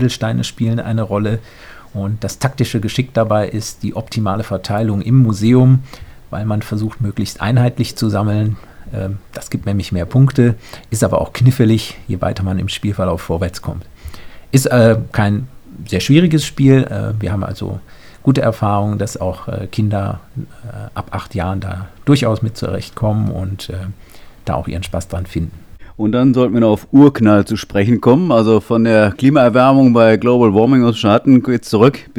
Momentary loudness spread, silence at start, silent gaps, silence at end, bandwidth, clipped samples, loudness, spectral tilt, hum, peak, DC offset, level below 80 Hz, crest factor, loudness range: 15 LU; 0 s; none; 0 s; 17 kHz; under 0.1%; -15 LUFS; -7 dB/octave; none; 0 dBFS; 0.5%; -38 dBFS; 14 dB; 8 LU